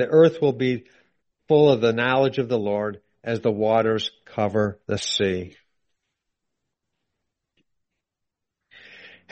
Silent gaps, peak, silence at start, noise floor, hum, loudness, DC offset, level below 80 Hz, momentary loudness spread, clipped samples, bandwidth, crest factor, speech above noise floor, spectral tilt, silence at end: none; -6 dBFS; 0 s; -84 dBFS; none; -22 LUFS; under 0.1%; -62 dBFS; 13 LU; under 0.1%; 8.4 kHz; 18 dB; 63 dB; -5.5 dB/octave; 0.25 s